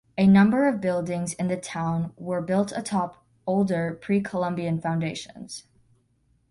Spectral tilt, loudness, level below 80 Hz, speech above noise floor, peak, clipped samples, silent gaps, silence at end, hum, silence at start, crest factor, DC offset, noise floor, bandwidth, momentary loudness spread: -6.5 dB/octave; -25 LUFS; -60 dBFS; 42 dB; -8 dBFS; under 0.1%; none; 0.9 s; none; 0.15 s; 18 dB; under 0.1%; -66 dBFS; 11.5 kHz; 16 LU